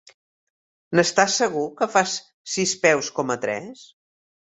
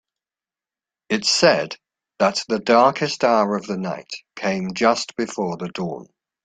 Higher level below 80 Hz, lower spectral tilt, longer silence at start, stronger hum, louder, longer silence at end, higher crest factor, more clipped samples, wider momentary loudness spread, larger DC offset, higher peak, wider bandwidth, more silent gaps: about the same, -66 dBFS vs -64 dBFS; about the same, -3 dB/octave vs -4 dB/octave; second, 0.9 s vs 1.1 s; neither; about the same, -22 LUFS vs -20 LUFS; first, 0.65 s vs 0.4 s; about the same, 22 dB vs 20 dB; neither; second, 11 LU vs 14 LU; neither; about the same, -2 dBFS vs -2 dBFS; second, 8.4 kHz vs 9.4 kHz; first, 2.34-2.45 s vs none